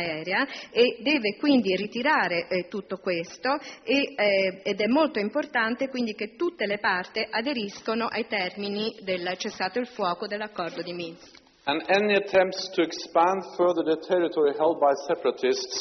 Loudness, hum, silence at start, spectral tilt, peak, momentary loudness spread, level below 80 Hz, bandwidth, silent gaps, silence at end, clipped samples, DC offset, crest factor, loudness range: -26 LUFS; none; 0 s; -2 dB/octave; -8 dBFS; 8 LU; -70 dBFS; 6.4 kHz; none; 0 s; under 0.1%; under 0.1%; 18 dB; 5 LU